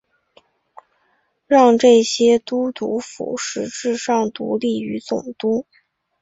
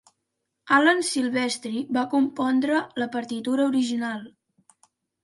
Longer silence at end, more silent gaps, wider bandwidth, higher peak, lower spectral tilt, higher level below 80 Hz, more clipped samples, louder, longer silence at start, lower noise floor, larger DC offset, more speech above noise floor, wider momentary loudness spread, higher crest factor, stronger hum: second, 0.6 s vs 0.95 s; neither; second, 8 kHz vs 11.5 kHz; first, -2 dBFS vs -6 dBFS; about the same, -4 dB/octave vs -3 dB/octave; first, -64 dBFS vs -74 dBFS; neither; first, -18 LUFS vs -24 LUFS; first, 1.5 s vs 0.65 s; second, -65 dBFS vs -80 dBFS; neither; second, 47 dB vs 56 dB; about the same, 12 LU vs 10 LU; about the same, 18 dB vs 20 dB; neither